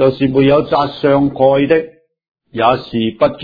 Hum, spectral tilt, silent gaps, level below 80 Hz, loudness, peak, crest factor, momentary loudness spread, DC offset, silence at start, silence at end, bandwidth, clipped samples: none; -9 dB/octave; 2.31-2.35 s; -44 dBFS; -13 LUFS; 0 dBFS; 14 dB; 6 LU; under 0.1%; 0 s; 0 s; 5 kHz; under 0.1%